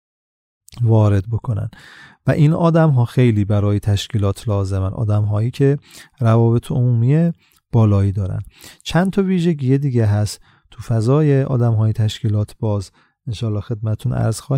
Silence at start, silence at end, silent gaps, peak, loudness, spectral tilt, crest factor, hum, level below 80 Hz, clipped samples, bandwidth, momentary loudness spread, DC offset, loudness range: 0.75 s; 0 s; none; -4 dBFS; -18 LUFS; -8 dB/octave; 14 dB; none; -44 dBFS; under 0.1%; 11.5 kHz; 11 LU; under 0.1%; 2 LU